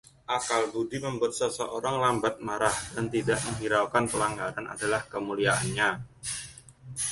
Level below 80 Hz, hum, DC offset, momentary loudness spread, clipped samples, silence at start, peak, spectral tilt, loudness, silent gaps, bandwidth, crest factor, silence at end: -56 dBFS; none; under 0.1%; 9 LU; under 0.1%; 0.3 s; -8 dBFS; -3.5 dB/octave; -29 LUFS; none; 12 kHz; 20 dB; 0 s